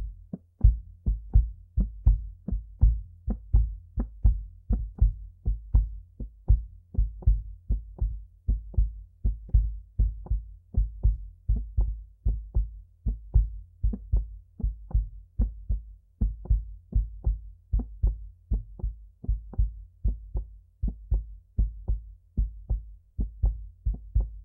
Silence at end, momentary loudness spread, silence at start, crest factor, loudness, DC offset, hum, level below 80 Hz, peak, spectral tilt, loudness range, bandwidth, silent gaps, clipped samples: 0 s; 10 LU; 0 s; 20 dB; -32 LUFS; under 0.1%; none; -28 dBFS; -8 dBFS; -14 dB/octave; 5 LU; 1.1 kHz; none; under 0.1%